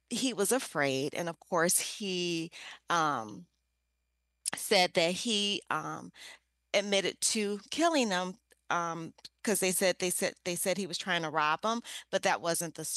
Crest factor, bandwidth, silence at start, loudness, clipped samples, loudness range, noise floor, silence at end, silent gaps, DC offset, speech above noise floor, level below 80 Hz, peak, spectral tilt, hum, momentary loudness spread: 20 dB; 12.5 kHz; 0.1 s; -31 LUFS; under 0.1%; 2 LU; -80 dBFS; 0 s; none; under 0.1%; 49 dB; -78 dBFS; -14 dBFS; -2.5 dB/octave; none; 11 LU